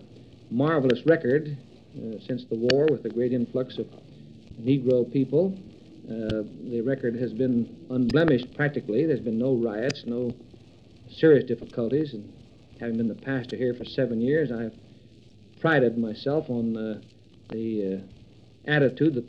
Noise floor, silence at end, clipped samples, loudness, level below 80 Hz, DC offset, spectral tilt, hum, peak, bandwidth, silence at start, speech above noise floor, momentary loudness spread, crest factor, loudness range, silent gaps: -53 dBFS; 0 s; under 0.1%; -26 LUFS; -58 dBFS; under 0.1%; -7.5 dB/octave; none; -6 dBFS; 7.8 kHz; 0 s; 27 dB; 15 LU; 20 dB; 3 LU; none